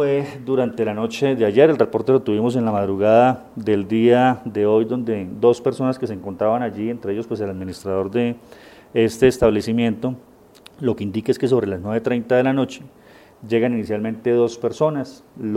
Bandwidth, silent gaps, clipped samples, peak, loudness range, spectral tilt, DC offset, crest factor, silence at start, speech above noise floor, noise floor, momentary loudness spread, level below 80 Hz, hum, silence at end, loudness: 14.5 kHz; none; under 0.1%; -2 dBFS; 5 LU; -7 dB/octave; under 0.1%; 18 dB; 0 s; 28 dB; -47 dBFS; 11 LU; -50 dBFS; none; 0 s; -20 LUFS